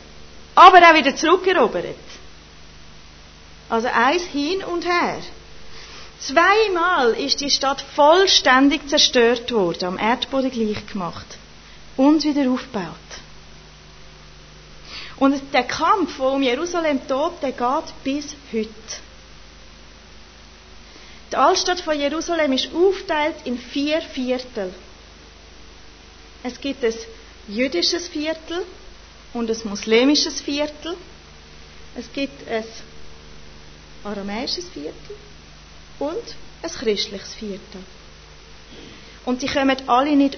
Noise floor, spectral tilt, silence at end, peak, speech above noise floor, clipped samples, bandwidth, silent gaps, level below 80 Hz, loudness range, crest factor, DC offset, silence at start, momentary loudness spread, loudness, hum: -44 dBFS; -3 dB/octave; 0 s; 0 dBFS; 25 dB; under 0.1%; 6.6 kHz; none; -48 dBFS; 14 LU; 22 dB; under 0.1%; 0 s; 21 LU; -19 LUFS; none